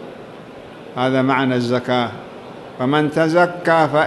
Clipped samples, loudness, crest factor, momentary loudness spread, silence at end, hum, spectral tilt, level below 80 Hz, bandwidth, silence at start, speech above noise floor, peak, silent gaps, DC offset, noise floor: under 0.1%; -18 LUFS; 16 dB; 21 LU; 0 s; none; -6.5 dB/octave; -60 dBFS; 12 kHz; 0 s; 20 dB; -2 dBFS; none; under 0.1%; -37 dBFS